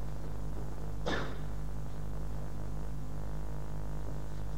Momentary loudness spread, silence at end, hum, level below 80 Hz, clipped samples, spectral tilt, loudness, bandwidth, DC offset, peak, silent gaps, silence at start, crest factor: 6 LU; 0 s; 50 Hz at -45 dBFS; -42 dBFS; under 0.1%; -6.5 dB/octave; -41 LUFS; 16 kHz; 2%; -18 dBFS; none; 0 s; 20 dB